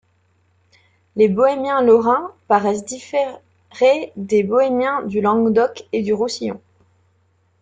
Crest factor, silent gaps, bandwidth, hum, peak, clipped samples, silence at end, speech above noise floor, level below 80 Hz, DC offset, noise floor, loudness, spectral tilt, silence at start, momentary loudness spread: 16 dB; none; 9.2 kHz; none; -2 dBFS; under 0.1%; 1.05 s; 44 dB; -62 dBFS; under 0.1%; -61 dBFS; -18 LUFS; -5.5 dB/octave; 1.15 s; 10 LU